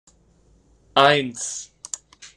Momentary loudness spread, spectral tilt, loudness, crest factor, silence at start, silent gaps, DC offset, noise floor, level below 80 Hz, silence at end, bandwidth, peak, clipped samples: 18 LU; -2.5 dB/octave; -20 LUFS; 22 dB; 0.95 s; none; under 0.1%; -58 dBFS; -60 dBFS; 0.1 s; 12.5 kHz; -2 dBFS; under 0.1%